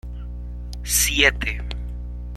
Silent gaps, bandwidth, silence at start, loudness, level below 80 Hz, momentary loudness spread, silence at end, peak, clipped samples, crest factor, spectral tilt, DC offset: none; 15.5 kHz; 0.05 s; -19 LUFS; -30 dBFS; 18 LU; 0 s; -2 dBFS; under 0.1%; 22 dB; -2 dB/octave; under 0.1%